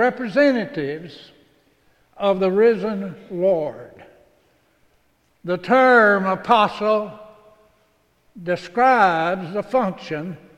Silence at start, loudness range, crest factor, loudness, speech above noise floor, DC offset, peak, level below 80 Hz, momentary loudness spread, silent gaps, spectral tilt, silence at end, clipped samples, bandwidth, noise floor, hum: 0 s; 4 LU; 18 dB; -19 LUFS; 43 dB; under 0.1%; -2 dBFS; -60 dBFS; 16 LU; none; -6.5 dB/octave; 0.2 s; under 0.1%; 10.5 kHz; -62 dBFS; none